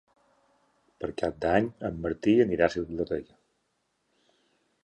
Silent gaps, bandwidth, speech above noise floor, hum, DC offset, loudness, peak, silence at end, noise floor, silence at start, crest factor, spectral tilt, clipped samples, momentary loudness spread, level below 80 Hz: none; 9 kHz; 49 dB; none; under 0.1%; -28 LUFS; -6 dBFS; 1.6 s; -76 dBFS; 1 s; 24 dB; -7 dB/octave; under 0.1%; 11 LU; -54 dBFS